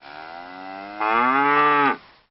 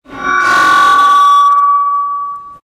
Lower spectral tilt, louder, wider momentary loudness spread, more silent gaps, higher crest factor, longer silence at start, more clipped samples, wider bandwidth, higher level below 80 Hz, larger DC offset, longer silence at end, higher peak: about the same, -1.5 dB/octave vs -1 dB/octave; second, -19 LUFS vs -8 LUFS; first, 20 LU vs 11 LU; neither; first, 16 dB vs 10 dB; about the same, 0.05 s vs 0.1 s; neither; second, 5.8 kHz vs 16 kHz; second, -62 dBFS vs -50 dBFS; neither; first, 0.3 s vs 0.1 s; second, -6 dBFS vs 0 dBFS